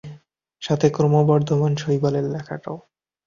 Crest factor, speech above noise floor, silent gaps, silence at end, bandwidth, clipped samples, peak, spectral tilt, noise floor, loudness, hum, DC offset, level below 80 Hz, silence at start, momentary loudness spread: 18 dB; 30 dB; none; 0.5 s; 7.4 kHz; under 0.1%; -4 dBFS; -7.5 dB/octave; -49 dBFS; -20 LUFS; none; under 0.1%; -56 dBFS; 0.05 s; 16 LU